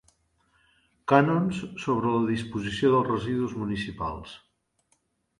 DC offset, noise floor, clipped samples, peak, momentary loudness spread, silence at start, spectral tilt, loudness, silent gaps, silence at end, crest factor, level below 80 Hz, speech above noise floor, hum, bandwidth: under 0.1%; -71 dBFS; under 0.1%; -4 dBFS; 12 LU; 1.05 s; -7 dB/octave; -26 LUFS; none; 1 s; 24 dB; -54 dBFS; 46 dB; none; 11.5 kHz